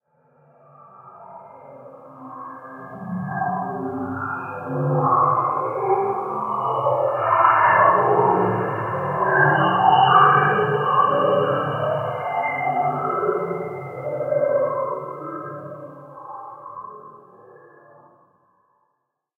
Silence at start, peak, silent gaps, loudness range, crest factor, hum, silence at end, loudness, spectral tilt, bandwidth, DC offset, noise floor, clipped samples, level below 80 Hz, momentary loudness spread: 1 s; -2 dBFS; none; 16 LU; 20 dB; none; 2.25 s; -20 LUFS; -8 dB/octave; 3.2 kHz; under 0.1%; -75 dBFS; under 0.1%; -66 dBFS; 22 LU